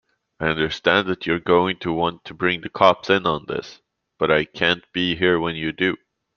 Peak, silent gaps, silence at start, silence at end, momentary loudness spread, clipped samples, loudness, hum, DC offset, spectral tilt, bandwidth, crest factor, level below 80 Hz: -2 dBFS; none; 0.4 s; 0.4 s; 8 LU; under 0.1%; -21 LUFS; none; under 0.1%; -6 dB/octave; 7.2 kHz; 20 dB; -52 dBFS